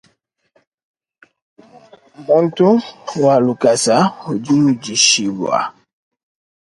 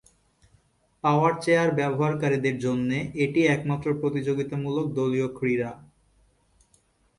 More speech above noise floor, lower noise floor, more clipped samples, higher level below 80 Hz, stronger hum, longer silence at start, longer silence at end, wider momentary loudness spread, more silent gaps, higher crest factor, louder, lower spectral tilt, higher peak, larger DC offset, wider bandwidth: first, 47 dB vs 40 dB; about the same, -62 dBFS vs -65 dBFS; neither; about the same, -62 dBFS vs -60 dBFS; neither; first, 2.2 s vs 1.05 s; second, 0.95 s vs 1.4 s; first, 10 LU vs 6 LU; neither; about the same, 18 dB vs 18 dB; first, -14 LUFS vs -25 LUFS; second, -4 dB/octave vs -7 dB/octave; first, 0 dBFS vs -8 dBFS; neither; about the same, 11.5 kHz vs 11.5 kHz